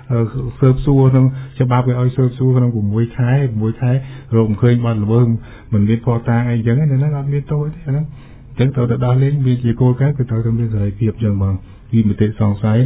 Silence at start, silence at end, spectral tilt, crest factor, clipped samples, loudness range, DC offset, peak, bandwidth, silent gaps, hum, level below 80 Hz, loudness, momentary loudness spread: 0.1 s; 0 s; -13 dB/octave; 14 dB; under 0.1%; 2 LU; under 0.1%; 0 dBFS; 3.9 kHz; none; none; -36 dBFS; -16 LUFS; 7 LU